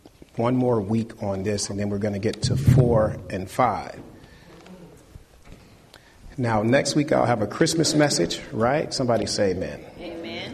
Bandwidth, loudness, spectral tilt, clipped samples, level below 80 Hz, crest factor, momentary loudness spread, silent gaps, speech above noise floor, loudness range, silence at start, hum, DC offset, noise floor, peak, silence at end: 13 kHz; -23 LUFS; -5.5 dB/octave; under 0.1%; -46 dBFS; 18 dB; 14 LU; none; 28 dB; 8 LU; 0.05 s; none; under 0.1%; -50 dBFS; -6 dBFS; 0 s